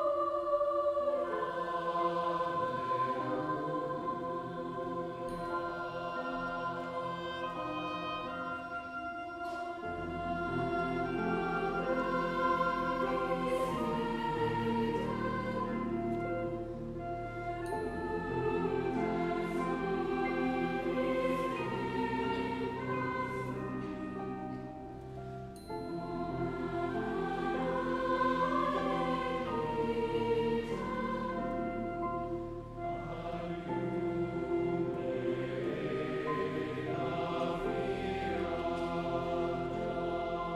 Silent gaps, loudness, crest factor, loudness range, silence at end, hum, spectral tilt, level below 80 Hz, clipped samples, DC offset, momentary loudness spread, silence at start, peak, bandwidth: none; -35 LUFS; 16 dB; 5 LU; 0 s; none; -7 dB/octave; -54 dBFS; under 0.1%; under 0.1%; 8 LU; 0 s; -18 dBFS; 13 kHz